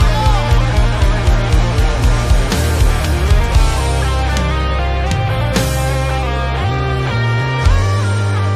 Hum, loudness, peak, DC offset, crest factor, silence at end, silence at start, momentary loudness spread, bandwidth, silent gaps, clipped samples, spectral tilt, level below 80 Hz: none; -15 LUFS; 0 dBFS; under 0.1%; 12 dB; 0 s; 0 s; 3 LU; 15.5 kHz; none; under 0.1%; -5.5 dB/octave; -16 dBFS